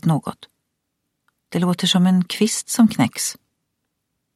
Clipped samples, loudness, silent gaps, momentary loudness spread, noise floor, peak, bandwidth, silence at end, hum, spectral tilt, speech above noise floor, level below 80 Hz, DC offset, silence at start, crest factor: under 0.1%; -19 LUFS; none; 9 LU; -76 dBFS; -6 dBFS; 15 kHz; 1.05 s; none; -4.5 dB/octave; 58 dB; -64 dBFS; under 0.1%; 0.05 s; 16 dB